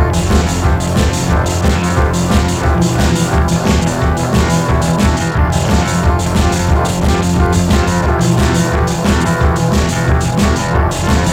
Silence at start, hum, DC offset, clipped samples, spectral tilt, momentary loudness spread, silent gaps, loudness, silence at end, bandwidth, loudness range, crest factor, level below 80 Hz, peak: 0 s; none; under 0.1%; under 0.1%; -5.5 dB/octave; 1 LU; none; -13 LUFS; 0 s; 16.5 kHz; 0 LU; 12 dB; -18 dBFS; 0 dBFS